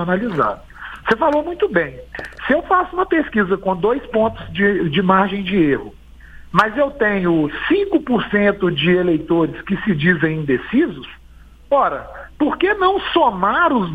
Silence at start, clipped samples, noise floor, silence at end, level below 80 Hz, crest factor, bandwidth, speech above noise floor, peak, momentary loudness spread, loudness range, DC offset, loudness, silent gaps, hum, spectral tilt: 0 s; under 0.1%; -43 dBFS; 0 s; -42 dBFS; 18 dB; 8.8 kHz; 26 dB; 0 dBFS; 7 LU; 2 LU; under 0.1%; -17 LUFS; none; none; -8 dB/octave